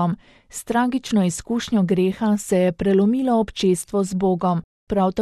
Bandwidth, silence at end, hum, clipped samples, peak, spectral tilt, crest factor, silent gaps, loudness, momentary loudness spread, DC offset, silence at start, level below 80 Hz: 13 kHz; 0 s; none; under 0.1%; -8 dBFS; -6 dB/octave; 14 dB; 4.64-4.87 s; -21 LUFS; 7 LU; under 0.1%; 0 s; -48 dBFS